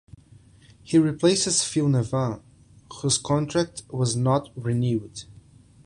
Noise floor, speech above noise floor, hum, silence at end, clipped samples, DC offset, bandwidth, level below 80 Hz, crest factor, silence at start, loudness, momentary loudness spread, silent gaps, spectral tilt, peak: -52 dBFS; 29 dB; none; 0.55 s; under 0.1%; under 0.1%; 11 kHz; -54 dBFS; 18 dB; 0.85 s; -24 LUFS; 10 LU; none; -5 dB/octave; -6 dBFS